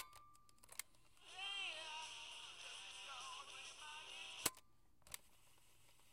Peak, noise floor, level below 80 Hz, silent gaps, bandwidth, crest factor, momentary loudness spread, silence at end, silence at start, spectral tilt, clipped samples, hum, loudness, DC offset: -20 dBFS; -73 dBFS; -80 dBFS; none; 16 kHz; 34 dB; 21 LU; 0 s; 0 s; 0.5 dB/octave; under 0.1%; none; -50 LUFS; under 0.1%